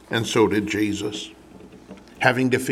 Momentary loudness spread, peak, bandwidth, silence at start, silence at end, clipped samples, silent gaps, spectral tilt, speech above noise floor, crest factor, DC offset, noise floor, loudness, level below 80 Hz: 12 LU; -2 dBFS; 16 kHz; 0.1 s; 0 s; under 0.1%; none; -5 dB/octave; 24 dB; 22 dB; under 0.1%; -45 dBFS; -22 LUFS; -56 dBFS